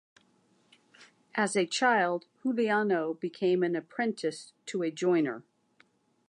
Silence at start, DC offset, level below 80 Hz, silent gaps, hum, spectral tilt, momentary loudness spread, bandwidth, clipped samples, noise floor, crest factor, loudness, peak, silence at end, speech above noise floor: 1 s; under 0.1%; -86 dBFS; none; none; -4.5 dB/octave; 10 LU; 11 kHz; under 0.1%; -68 dBFS; 18 dB; -29 LUFS; -12 dBFS; 0.9 s; 39 dB